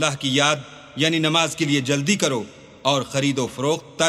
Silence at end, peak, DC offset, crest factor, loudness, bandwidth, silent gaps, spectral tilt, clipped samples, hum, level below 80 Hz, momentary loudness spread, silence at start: 0 s; -2 dBFS; under 0.1%; 20 dB; -21 LUFS; 14.5 kHz; none; -3.5 dB/octave; under 0.1%; none; -60 dBFS; 8 LU; 0 s